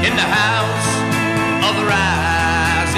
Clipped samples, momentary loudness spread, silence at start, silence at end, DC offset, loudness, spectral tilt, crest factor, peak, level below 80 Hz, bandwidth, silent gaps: under 0.1%; 3 LU; 0 s; 0 s; under 0.1%; -16 LUFS; -4 dB/octave; 14 dB; -2 dBFS; -34 dBFS; 15.5 kHz; none